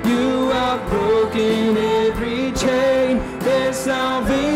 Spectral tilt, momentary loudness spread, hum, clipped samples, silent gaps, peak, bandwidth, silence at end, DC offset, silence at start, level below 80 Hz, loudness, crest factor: -5 dB/octave; 3 LU; none; under 0.1%; none; -10 dBFS; 16 kHz; 0 s; under 0.1%; 0 s; -38 dBFS; -19 LUFS; 8 dB